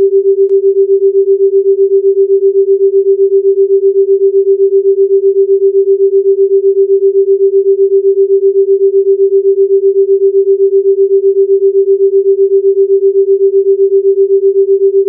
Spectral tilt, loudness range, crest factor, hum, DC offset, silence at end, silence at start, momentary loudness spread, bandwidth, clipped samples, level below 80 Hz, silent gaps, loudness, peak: -13 dB/octave; 0 LU; 6 dB; none; under 0.1%; 0 s; 0 s; 0 LU; 0.5 kHz; under 0.1%; -86 dBFS; none; -9 LUFS; -2 dBFS